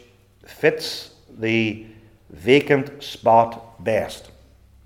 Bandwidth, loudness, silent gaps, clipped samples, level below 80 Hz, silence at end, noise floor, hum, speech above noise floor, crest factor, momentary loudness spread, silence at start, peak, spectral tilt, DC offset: 17 kHz; -21 LUFS; none; under 0.1%; -56 dBFS; 0.65 s; -51 dBFS; none; 31 dB; 22 dB; 16 LU; 0.5 s; -2 dBFS; -5.5 dB/octave; under 0.1%